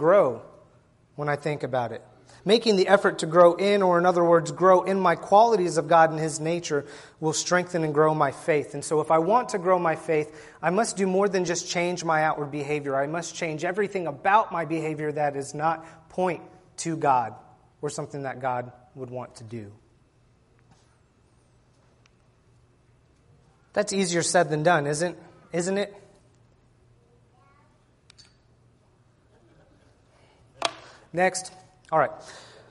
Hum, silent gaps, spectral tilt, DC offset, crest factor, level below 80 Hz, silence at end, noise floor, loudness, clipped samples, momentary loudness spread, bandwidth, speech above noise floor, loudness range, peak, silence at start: none; none; -4.5 dB/octave; under 0.1%; 22 dB; -66 dBFS; 0.25 s; -61 dBFS; -24 LUFS; under 0.1%; 15 LU; 11.5 kHz; 37 dB; 15 LU; -4 dBFS; 0 s